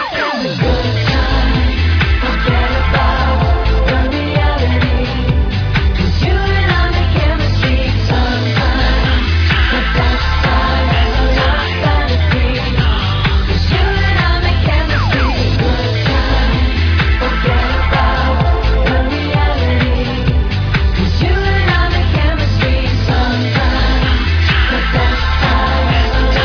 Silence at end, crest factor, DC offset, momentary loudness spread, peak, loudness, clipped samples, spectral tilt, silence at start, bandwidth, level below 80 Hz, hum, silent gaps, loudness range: 0 s; 12 dB; under 0.1%; 2 LU; 0 dBFS; -14 LUFS; under 0.1%; -6.5 dB/octave; 0 s; 5.4 kHz; -16 dBFS; none; none; 1 LU